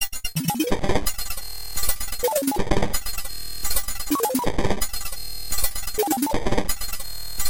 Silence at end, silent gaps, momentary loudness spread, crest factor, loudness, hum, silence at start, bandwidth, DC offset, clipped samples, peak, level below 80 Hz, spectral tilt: 0 s; none; 8 LU; 18 dB; -25 LUFS; none; 0 s; 17.5 kHz; 5%; under 0.1%; -4 dBFS; -34 dBFS; -3.5 dB/octave